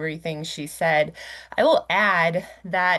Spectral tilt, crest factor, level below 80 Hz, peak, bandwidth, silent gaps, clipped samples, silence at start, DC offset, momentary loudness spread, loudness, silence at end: -4.5 dB/octave; 16 dB; -60 dBFS; -6 dBFS; 12.5 kHz; none; under 0.1%; 0 s; under 0.1%; 12 LU; -22 LUFS; 0 s